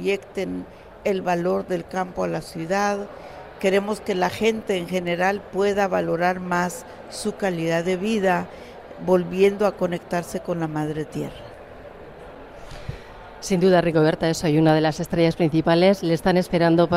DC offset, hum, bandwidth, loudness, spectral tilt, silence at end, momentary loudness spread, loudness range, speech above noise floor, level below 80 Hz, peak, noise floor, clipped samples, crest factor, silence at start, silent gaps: under 0.1%; none; 16 kHz; -22 LUFS; -6 dB/octave; 0 s; 22 LU; 7 LU; 19 dB; -50 dBFS; -6 dBFS; -41 dBFS; under 0.1%; 16 dB; 0 s; none